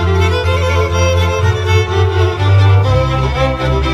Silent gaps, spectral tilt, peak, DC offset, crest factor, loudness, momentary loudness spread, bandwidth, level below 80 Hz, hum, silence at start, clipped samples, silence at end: none; -6 dB/octave; 0 dBFS; under 0.1%; 10 dB; -13 LUFS; 4 LU; 8 kHz; -22 dBFS; none; 0 s; under 0.1%; 0 s